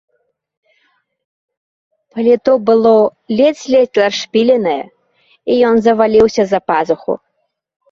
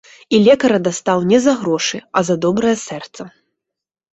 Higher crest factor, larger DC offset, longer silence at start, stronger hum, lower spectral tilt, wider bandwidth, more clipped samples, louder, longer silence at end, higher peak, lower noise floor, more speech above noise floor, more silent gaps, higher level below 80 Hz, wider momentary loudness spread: about the same, 14 dB vs 14 dB; neither; first, 2.15 s vs 0.3 s; neither; about the same, -5 dB/octave vs -5 dB/octave; second, 7.4 kHz vs 8.2 kHz; neither; about the same, -13 LUFS vs -15 LUFS; about the same, 0.75 s vs 0.85 s; about the same, -2 dBFS vs -2 dBFS; second, -61 dBFS vs -83 dBFS; second, 49 dB vs 68 dB; neither; about the same, -52 dBFS vs -56 dBFS; second, 12 LU vs 17 LU